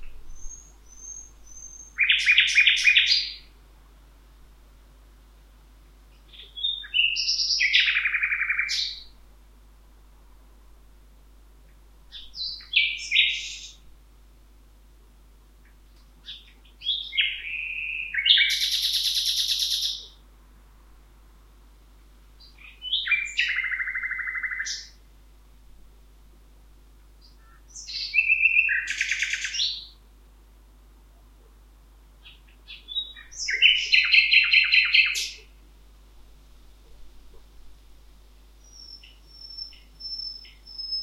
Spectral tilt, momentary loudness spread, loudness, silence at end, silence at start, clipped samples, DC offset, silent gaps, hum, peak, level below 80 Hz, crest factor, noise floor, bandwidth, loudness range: 2.5 dB/octave; 25 LU; -21 LUFS; 0 s; 0 s; under 0.1%; under 0.1%; none; 50 Hz at -50 dBFS; -2 dBFS; -52 dBFS; 26 dB; -53 dBFS; 16.5 kHz; 18 LU